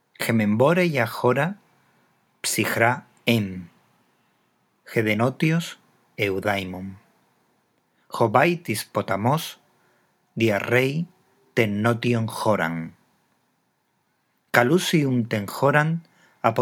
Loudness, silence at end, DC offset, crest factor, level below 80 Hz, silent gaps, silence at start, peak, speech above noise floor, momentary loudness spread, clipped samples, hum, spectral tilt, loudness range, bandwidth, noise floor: -23 LUFS; 0 s; under 0.1%; 24 dB; -72 dBFS; none; 0.2 s; 0 dBFS; 48 dB; 14 LU; under 0.1%; none; -5.5 dB/octave; 3 LU; 19.5 kHz; -70 dBFS